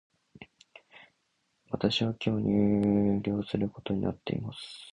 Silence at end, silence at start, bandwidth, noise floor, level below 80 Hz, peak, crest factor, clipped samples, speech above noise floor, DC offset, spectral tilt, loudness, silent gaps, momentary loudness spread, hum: 0 s; 0.4 s; 10 kHz; -76 dBFS; -56 dBFS; -12 dBFS; 18 dB; under 0.1%; 47 dB; under 0.1%; -7.5 dB/octave; -29 LUFS; none; 10 LU; none